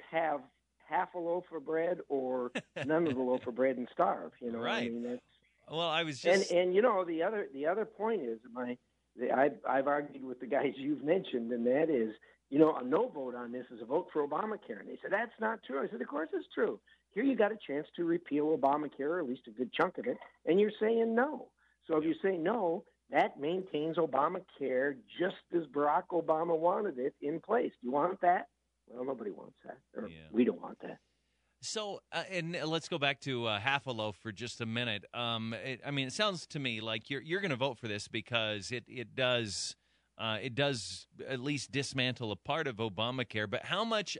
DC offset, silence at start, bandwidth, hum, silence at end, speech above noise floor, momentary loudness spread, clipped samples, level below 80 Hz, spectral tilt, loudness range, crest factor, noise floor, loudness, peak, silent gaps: under 0.1%; 0 s; 11 kHz; none; 0 s; 44 dB; 11 LU; under 0.1%; -76 dBFS; -5 dB/octave; 4 LU; 22 dB; -78 dBFS; -34 LUFS; -12 dBFS; none